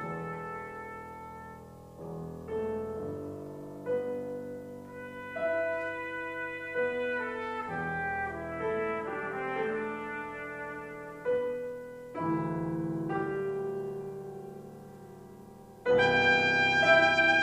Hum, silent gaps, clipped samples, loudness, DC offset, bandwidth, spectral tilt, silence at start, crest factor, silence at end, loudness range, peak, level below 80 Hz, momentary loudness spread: none; none; under 0.1%; -31 LUFS; under 0.1%; 15 kHz; -5.5 dB/octave; 0 s; 22 dB; 0 s; 9 LU; -10 dBFS; -62 dBFS; 21 LU